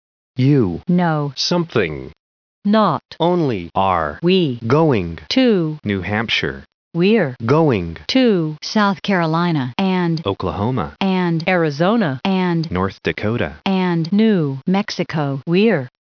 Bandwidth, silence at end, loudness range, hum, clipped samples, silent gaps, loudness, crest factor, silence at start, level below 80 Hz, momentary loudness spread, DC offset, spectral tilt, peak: 5.4 kHz; 0.2 s; 2 LU; none; under 0.1%; 2.19-2.62 s, 6.74-6.91 s; -18 LUFS; 14 dB; 0.35 s; -48 dBFS; 6 LU; under 0.1%; -7 dB/octave; -4 dBFS